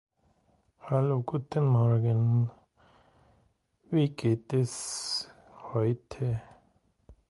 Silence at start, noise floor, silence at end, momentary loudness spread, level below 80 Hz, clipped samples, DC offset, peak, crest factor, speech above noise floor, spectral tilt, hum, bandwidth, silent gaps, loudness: 0.85 s; -69 dBFS; 0.15 s; 10 LU; -62 dBFS; under 0.1%; under 0.1%; -14 dBFS; 16 dB; 42 dB; -6.5 dB/octave; none; 11.5 kHz; none; -29 LUFS